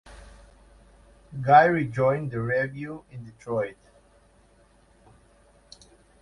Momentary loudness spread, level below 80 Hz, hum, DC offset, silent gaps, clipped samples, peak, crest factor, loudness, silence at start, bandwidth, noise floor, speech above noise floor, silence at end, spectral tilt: 24 LU; -56 dBFS; none; under 0.1%; none; under 0.1%; -4 dBFS; 24 dB; -23 LUFS; 0.05 s; 11 kHz; -59 dBFS; 35 dB; 2.5 s; -7.5 dB/octave